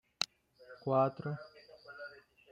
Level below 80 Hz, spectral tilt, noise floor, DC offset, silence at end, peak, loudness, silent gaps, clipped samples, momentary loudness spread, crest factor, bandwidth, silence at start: -80 dBFS; -5 dB/octave; -59 dBFS; under 0.1%; 0.35 s; -12 dBFS; -36 LUFS; none; under 0.1%; 23 LU; 26 dB; 15.5 kHz; 0.2 s